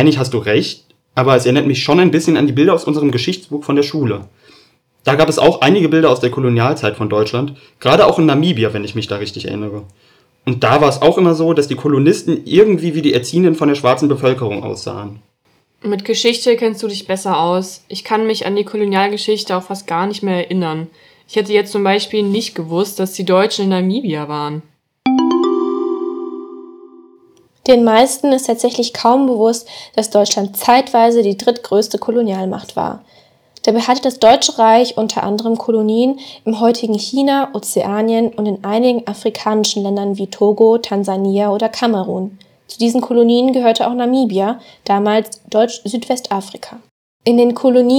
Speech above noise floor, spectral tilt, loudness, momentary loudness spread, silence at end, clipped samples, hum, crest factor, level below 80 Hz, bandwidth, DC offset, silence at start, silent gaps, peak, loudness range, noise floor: 45 dB; -5.5 dB/octave; -15 LUFS; 11 LU; 0 s; 0.1%; none; 14 dB; -56 dBFS; 20 kHz; under 0.1%; 0 s; 46.91-47.20 s; 0 dBFS; 4 LU; -59 dBFS